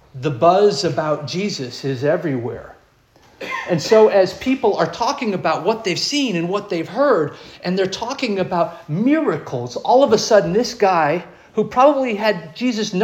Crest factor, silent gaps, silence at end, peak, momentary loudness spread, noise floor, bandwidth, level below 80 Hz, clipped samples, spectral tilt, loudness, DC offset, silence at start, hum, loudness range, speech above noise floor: 16 dB; none; 0 s; -2 dBFS; 11 LU; -53 dBFS; 16 kHz; -56 dBFS; under 0.1%; -5 dB/octave; -18 LUFS; under 0.1%; 0.15 s; none; 3 LU; 35 dB